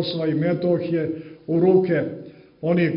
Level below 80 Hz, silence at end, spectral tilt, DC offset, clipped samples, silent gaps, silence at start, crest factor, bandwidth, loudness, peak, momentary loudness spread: -62 dBFS; 0 s; -11.5 dB/octave; under 0.1%; under 0.1%; none; 0 s; 16 dB; 5.4 kHz; -22 LUFS; -6 dBFS; 13 LU